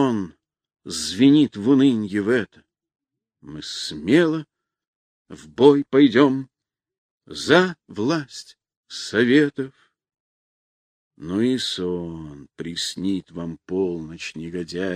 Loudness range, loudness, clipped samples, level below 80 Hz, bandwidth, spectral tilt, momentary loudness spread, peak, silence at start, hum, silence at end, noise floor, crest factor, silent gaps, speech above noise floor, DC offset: 7 LU; -20 LUFS; under 0.1%; -60 dBFS; 10.5 kHz; -5.5 dB/octave; 20 LU; -2 dBFS; 0 s; none; 0 s; under -90 dBFS; 20 dB; 4.88-5.25 s, 6.98-7.18 s, 8.77-8.83 s, 10.20-11.11 s; over 69 dB; under 0.1%